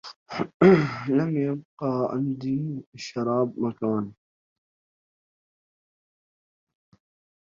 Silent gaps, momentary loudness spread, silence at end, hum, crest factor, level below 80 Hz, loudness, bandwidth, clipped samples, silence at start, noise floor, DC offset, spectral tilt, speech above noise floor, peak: 0.16-0.26 s, 0.54-0.60 s, 1.65-1.77 s, 2.86-2.93 s; 16 LU; 3.3 s; none; 22 dB; -64 dBFS; -25 LUFS; 7.4 kHz; under 0.1%; 0.05 s; under -90 dBFS; under 0.1%; -8 dB/octave; over 66 dB; -4 dBFS